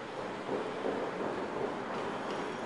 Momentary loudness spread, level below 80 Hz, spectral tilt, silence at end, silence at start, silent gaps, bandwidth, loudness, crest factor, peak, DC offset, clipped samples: 2 LU; -70 dBFS; -5.5 dB/octave; 0 s; 0 s; none; 11.5 kHz; -37 LUFS; 14 dB; -22 dBFS; under 0.1%; under 0.1%